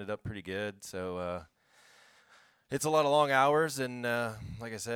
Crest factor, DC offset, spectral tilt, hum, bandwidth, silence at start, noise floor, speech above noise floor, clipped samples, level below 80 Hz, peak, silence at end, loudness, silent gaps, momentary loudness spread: 20 dB; under 0.1%; -4 dB/octave; none; 18.5 kHz; 0 s; -63 dBFS; 32 dB; under 0.1%; -64 dBFS; -12 dBFS; 0 s; -31 LUFS; none; 14 LU